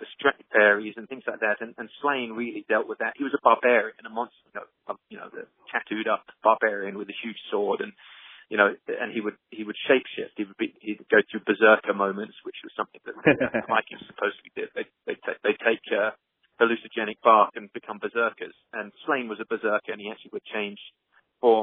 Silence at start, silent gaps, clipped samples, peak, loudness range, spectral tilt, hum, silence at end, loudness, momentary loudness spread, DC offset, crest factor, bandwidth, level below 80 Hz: 0 s; none; under 0.1%; -2 dBFS; 5 LU; -2 dB/octave; none; 0 s; -25 LUFS; 17 LU; under 0.1%; 24 dB; 3.9 kHz; -72 dBFS